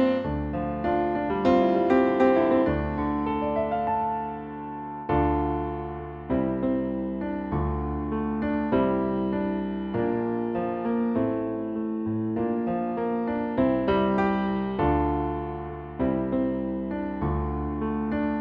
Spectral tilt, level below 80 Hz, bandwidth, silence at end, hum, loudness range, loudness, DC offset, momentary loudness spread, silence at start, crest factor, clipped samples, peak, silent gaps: -9.5 dB/octave; -40 dBFS; 6.8 kHz; 0 s; none; 5 LU; -26 LUFS; under 0.1%; 8 LU; 0 s; 16 dB; under 0.1%; -10 dBFS; none